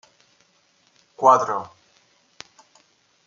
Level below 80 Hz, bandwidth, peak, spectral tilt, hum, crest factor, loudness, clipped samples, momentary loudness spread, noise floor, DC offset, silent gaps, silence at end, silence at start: -76 dBFS; 7.6 kHz; -2 dBFS; -4.5 dB/octave; none; 24 dB; -19 LUFS; under 0.1%; 28 LU; -62 dBFS; under 0.1%; none; 1.6 s; 1.2 s